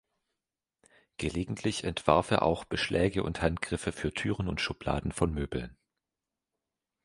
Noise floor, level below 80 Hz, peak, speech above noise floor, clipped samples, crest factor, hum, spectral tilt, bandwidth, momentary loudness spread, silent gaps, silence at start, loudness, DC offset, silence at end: -90 dBFS; -46 dBFS; -6 dBFS; 59 dB; under 0.1%; 26 dB; none; -5.5 dB/octave; 11.5 kHz; 9 LU; none; 1.2 s; -31 LUFS; under 0.1%; 1.3 s